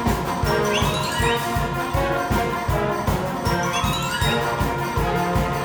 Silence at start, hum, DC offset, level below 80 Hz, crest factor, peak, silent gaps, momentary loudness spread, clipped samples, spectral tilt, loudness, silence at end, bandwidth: 0 s; none; under 0.1%; -32 dBFS; 14 dB; -8 dBFS; none; 3 LU; under 0.1%; -5 dB/octave; -22 LUFS; 0 s; over 20 kHz